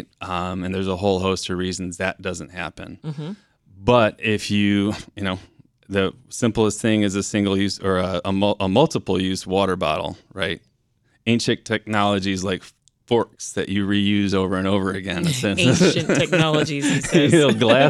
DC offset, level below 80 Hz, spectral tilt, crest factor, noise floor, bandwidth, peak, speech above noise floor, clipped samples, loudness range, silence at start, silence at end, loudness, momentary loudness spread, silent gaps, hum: under 0.1%; -52 dBFS; -5 dB/octave; 20 dB; -64 dBFS; 13 kHz; -2 dBFS; 44 dB; under 0.1%; 5 LU; 0.2 s; 0 s; -21 LUFS; 12 LU; none; none